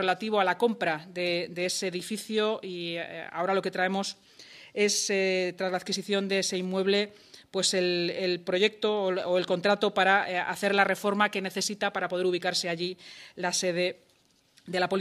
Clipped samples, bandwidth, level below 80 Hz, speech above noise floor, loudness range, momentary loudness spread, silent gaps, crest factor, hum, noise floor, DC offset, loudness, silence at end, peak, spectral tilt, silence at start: under 0.1%; 14.5 kHz; -78 dBFS; 37 dB; 4 LU; 9 LU; none; 22 dB; none; -65 dBFS; under 0.1%; -28 LUFS; 0 s; -6 dBFS; -3 dB/octave; 0 s